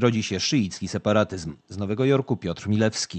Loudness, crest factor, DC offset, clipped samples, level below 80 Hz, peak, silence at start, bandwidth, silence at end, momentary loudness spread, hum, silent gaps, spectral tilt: -24 LUFS; 18 dB; under 0.1%; under 0.1%; -50 dBFS; -6 dBFS; 0 s; 8.8 kHz; 0 s; 9 LU; none; none; -5 dB/octave